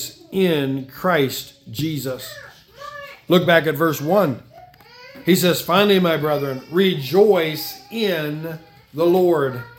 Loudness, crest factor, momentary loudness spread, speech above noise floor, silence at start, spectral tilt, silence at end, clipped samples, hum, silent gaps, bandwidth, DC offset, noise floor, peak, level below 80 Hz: -19 LUFS; 20 dB; 18 LU; 26 dB; 0 s; -5.5 dB/octave; 0.1 s; under 0.1%; none; none; 18 kHz; under 0.1%; -45 dBFS; 0 dBFS; -60 dBFS